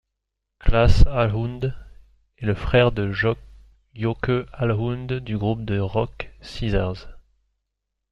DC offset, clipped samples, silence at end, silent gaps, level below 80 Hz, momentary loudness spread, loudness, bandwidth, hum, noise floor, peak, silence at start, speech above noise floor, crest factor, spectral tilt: under 0.1%; under 0.1%; 0.9 s; none; -28 dBFS; 12 LU; -23 LUFS; 7.6 kHz; none; -80 dBFS; -2 dBFS; 0.65 s; 60 dB; 20 dB; -7.5 dB/octave